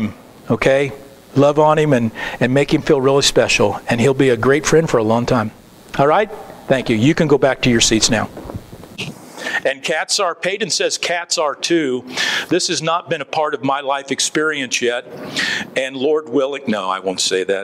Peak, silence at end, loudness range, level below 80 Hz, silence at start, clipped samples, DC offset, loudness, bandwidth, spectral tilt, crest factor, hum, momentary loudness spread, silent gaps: 0 dBFS; 0 s; 4 LU; -42 dBFS; 0 s; under 0.1%; under 0.1%; -16 LUFS; 16 kHz; -4 dB/octave; 16 dB; none; 11 LU; none